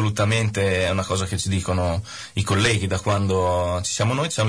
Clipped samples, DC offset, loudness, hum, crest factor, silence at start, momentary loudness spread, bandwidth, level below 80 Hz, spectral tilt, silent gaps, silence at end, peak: under 0.1%; 0.1%; -22 LUFS; none; 12 dB; 0 s; 4 LU; 11 kHz; -42 dBFS; -4.5 dB/octave; none; 0 s; -8 dBFS